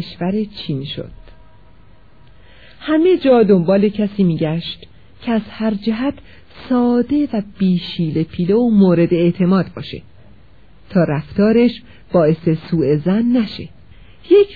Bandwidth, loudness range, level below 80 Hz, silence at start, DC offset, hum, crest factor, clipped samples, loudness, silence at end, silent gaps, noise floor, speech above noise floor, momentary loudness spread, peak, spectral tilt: 4.9 kHz; 4 LU; -46 dBFS; 0 s; 0.7%; none; 16 dB; under 0.1%; -16 LUFS; 0 s; none; -48 dBFS; 32 dB; 17 LU; -2 dBFS; -10.5 dB/octave